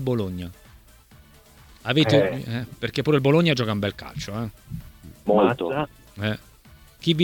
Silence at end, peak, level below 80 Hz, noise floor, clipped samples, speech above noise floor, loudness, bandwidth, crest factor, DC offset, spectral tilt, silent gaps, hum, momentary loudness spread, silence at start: 0 s; -4 dBFS; -50 dBFS; -51 dBFS; under 0.1%; 28 dB; -23 LUFS; 19 kHz; 20 dB; under 0.1%; -6.5 dB/octave; none; none; 16 LU; 0 s